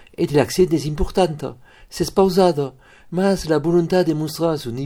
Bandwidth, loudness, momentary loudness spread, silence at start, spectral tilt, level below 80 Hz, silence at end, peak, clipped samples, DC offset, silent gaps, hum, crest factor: 17 kHz; -19 LUFS; 11 LU; 0.2 s; -6 dB/octave; -36 dBFS; 0 s; 0 dBFS; under 0.1%; under 0.1%; none; none; 18 dB